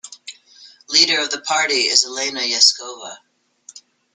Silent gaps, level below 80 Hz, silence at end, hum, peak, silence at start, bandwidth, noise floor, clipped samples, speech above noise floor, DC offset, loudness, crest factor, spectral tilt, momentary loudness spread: none; -72 dBFS; 0.35 s; none; 0 dBFS; 0.05 s; 12.5 kHz; -47 dBFS; under 0.1%; 29 dB; under 0.1%; -15 LUFS; 20 dB; 1.5 dB/octave; 22 LU